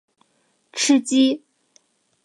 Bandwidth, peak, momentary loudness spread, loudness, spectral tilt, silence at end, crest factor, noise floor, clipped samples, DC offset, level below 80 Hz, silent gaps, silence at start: 11.5 kHz; -6 dBFS; 15 LU; -19 LUFS; -1.5 dB/octave; 0.85 s; 18 dB; -66 dBFS; under 0.1%; under 0.1%; -78 dBFS; none; 0.75 s